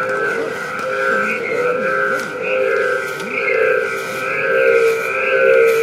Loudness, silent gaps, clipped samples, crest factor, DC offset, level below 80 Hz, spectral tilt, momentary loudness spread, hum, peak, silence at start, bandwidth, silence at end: -17 LUFS; none; under 0.1%; 16 dB; under 0.1%; -62 dBFS; -3.5 dB/octave; 8 LU; none; -2 dBFS; 0 s; 15.5 kHz; 0 s